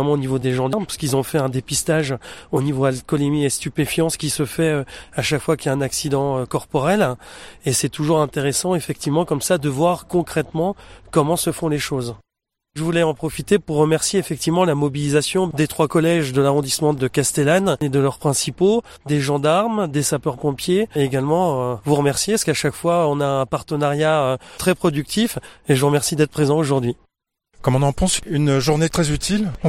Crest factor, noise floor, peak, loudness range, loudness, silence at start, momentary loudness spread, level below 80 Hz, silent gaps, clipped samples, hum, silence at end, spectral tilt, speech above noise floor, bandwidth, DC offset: 16 dB; -82 dBFS; -4 dBFS; 3 LU; -20 LUFS; 0 s; 6 LU; -44 dBFS; none; under 0.1%; none; 0 s; -5 dB/octave; 63 dB; 16.5 kHz; under 0.1%